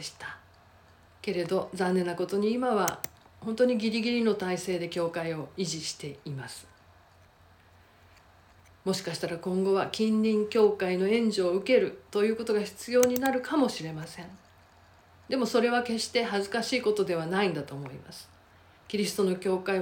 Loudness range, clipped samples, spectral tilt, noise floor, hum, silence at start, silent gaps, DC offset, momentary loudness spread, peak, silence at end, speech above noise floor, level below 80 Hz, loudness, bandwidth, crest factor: 10 LU; under 0.1%; -5 dB/octave; -58 dBFS; none; 0 s; none; under 0.1%; 14 LU; -6 dBFS; 0 s; 30 dB; -66 dBFS; -28 LUFS; 17 kHz; 22 dB